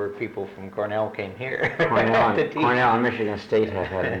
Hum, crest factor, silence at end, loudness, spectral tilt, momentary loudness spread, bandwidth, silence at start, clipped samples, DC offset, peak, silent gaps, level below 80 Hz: none; 12 dB; 0 s; -23 LUFS; -7 dB/octave; 12 LU; 9.2 kHz; 0 s; under 0.1%; under 0.1%; -10 dBFS; none; -56 dBFS